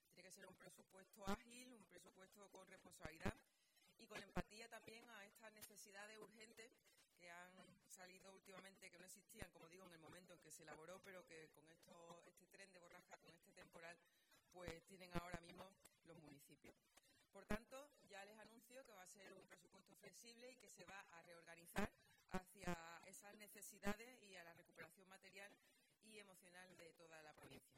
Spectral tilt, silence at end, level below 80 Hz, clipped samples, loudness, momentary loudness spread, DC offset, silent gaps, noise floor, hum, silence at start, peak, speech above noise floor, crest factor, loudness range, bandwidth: -4 dB/octave; 0 s; -72 dBFS; under 0.1%; -60 LUFS; 14 LU; under 0.1%; none; -79 dBFS; none; 0 s; -30 dBFS; 21 dB; 28 dB; 8 LU; 16 kHz